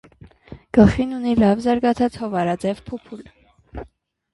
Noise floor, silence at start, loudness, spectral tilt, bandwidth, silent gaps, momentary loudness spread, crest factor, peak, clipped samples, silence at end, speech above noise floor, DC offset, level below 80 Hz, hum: -54 dBFS; 0.5 s; -19 LUFS; -7.5 dB/octave; 11.5 kHz; none; 23 LU; 20 dB; 0 dBFS; under 0.1%; 0.5 s; 36 dB; under 0.1%; -40 dBFS; none